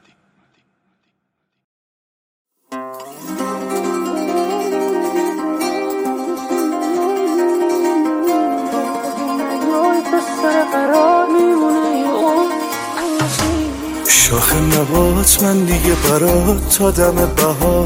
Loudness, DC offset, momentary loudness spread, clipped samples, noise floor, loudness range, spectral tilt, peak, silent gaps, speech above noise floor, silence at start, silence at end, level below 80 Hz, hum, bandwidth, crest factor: -15 LUFS; under 0.1%; 10 LU; under 0.1%; -72 dBFS; 10 LU; -4 dB/octave; 0 dBFS; none; 59 dB; 2.7 s; 0 s; -30 dBFS; none; 17 kHz; 16 dB